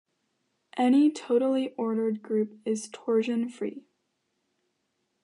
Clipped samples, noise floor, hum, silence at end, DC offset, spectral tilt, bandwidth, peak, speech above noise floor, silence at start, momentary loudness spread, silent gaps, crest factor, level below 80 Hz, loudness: under 0.1%; -78 dBFS; none; 1.45 s; under 0.1%; -5.5 dB/octave; 11 kHz; -14 dBFS; 51 dB; 0.75 s; 11 LU; none; 14 dB; -84 dBFS; -27 LUFS